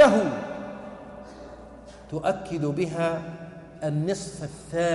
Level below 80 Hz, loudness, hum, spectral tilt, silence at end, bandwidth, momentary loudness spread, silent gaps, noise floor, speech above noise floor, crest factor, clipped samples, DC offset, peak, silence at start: -54 dBFS; -28 LUFS; none; -6 dB/octave; 0 s; 11.5 kHz; 17 LU; none; -45 dBFS; 18 dB; 20 dB; under 0.1%; under 0.1%; -6 dBFS; 0 s